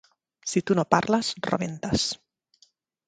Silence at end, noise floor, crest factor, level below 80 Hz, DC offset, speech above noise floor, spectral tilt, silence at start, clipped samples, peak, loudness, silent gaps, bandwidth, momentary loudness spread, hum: 0.95 s; -64 dBFS; 26 dB; -52 dBFS; under 0.1%; 39 dB; -4.5 dB/octave; 0.45 s; under 0.1%; 0 dBFS; -26 LUFS; none; 9.4 kHz; 7 LU; none